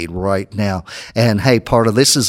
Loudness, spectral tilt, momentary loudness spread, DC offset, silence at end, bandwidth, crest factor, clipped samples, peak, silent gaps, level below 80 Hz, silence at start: -16 LUFS; -4.5 dB/octave; 10 LU; under 0.1%; 0 s; 16.5 kHz; 16 dB; under 0.1%; 0 dBFS; none; -40 dBFS; 0 s